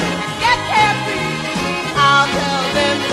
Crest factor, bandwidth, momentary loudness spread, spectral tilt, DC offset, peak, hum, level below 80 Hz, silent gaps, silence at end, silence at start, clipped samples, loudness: 16 dB; 14 kHz; 8 LU; -3.5 dB/octave; under 0.1%; -2 dBFS; none; -42 dBFS; none; 0 s; 0 s; under 0.1%; -15 LUFS